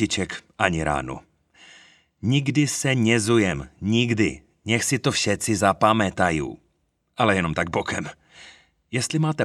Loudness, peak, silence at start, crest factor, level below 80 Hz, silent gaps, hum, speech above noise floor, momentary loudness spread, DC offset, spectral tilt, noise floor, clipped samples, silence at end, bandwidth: -22 LUFS; 0 dBFS; 0 s; 24 dB; -48 dBFS; none; none; 48 dB; 11 LU; under 0.1%; -4.5 dB/octave; -70 dBFS; under 0.1%; 0 s; 14 kHz